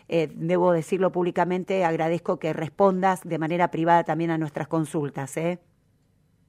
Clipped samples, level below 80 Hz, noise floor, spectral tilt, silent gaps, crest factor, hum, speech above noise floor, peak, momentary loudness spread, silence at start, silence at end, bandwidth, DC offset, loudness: under 0.1%; -68 dBFS; -64 dBFS; -7 dB/octave; none; 18 dB; none; 40 dB; -6 dBFS; 8 LU; 0.1 s; 0.9 s; 15 kHz; under 0.1%; -24 LUFS